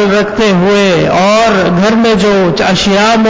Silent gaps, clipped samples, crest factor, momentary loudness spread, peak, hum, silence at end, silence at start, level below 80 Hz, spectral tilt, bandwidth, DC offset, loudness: none; under 0.1%; 6 dB; 2 LU; -2 dBFS; none; 0 s; 0 s; -36 dBFS; -5 dB/octave; 8 kHz; 0.8%; -8 LUFS